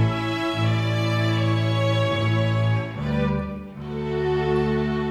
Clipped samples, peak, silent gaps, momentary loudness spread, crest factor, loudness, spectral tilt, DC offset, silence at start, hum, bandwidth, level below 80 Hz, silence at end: under 0.1%; -10 dBFS; none; 6 LU; 12 dB; -23 LUFS; -7 dB/octave; under 0.1%; 0 s; none; 9.4 kHz; -42 dBFS; 0 s